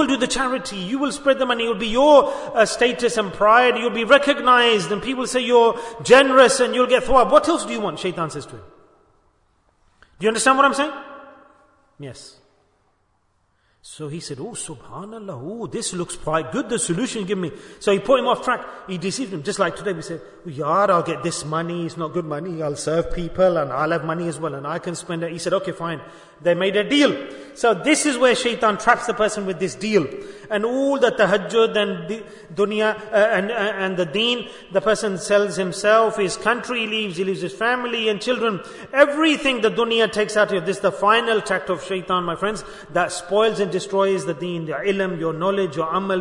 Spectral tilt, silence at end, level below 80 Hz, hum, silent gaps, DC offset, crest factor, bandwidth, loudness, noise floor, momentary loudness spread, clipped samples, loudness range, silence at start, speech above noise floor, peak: -4 dB/octave; 0 s; -48 dBFS; none; none; under 0.1%; 20 dB; 11 kHz; -20 LUFS; -65 dBFS; 14 LU; under 0.1%; 9 LU; 0 s; 45 dB; 0 dBFS